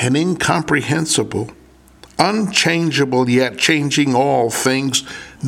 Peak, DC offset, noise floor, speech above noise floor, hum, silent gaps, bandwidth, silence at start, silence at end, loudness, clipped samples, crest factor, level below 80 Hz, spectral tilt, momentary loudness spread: 0 dBFS; under 0.1%; -45 dBFS; 29 dB; none; none; 16.5 kHz; 0 s; 0 s; -16 LUFS; under 0.1%; 18 dB; -52 dBFS; -4 dB/octave; 6 LU